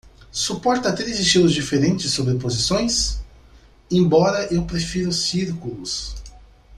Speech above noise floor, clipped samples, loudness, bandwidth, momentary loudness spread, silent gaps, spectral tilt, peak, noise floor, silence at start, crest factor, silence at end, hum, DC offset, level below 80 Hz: 29 dB; under 0.1%; -20 LUFS; 12.5 kHz; 11 LU; none; -4.5 dB/octave; -2 dBFS; -49 dBFS; 0.05 s; 18 dB; 0 s; none; under 0.1%; -38 dBFS